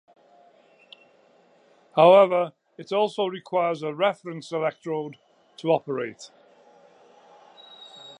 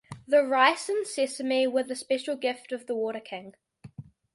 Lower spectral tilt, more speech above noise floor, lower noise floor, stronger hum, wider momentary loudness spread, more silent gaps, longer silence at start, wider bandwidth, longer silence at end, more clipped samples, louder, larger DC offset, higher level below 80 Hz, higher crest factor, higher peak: first, -6 dB/octave vs -3 dB/octave; first, 36 dB vs 20 dB; first, -59 dBFS vs -47 dBFS; neither; first, 27 LU vs 17 LU; neither; first, 1.95 s vs 0.1 s; about the same, 10.5 kHz vs 11.5 kHz; second, 0.05 s vs 0.3 s; neither; first, -23 LUFS vs -27 LUFS; neither; second, -84 dBFS vs -72 dBFS; about the same, 22 dB vs 20 dB; first, -4 dBFS vs -8 dBFS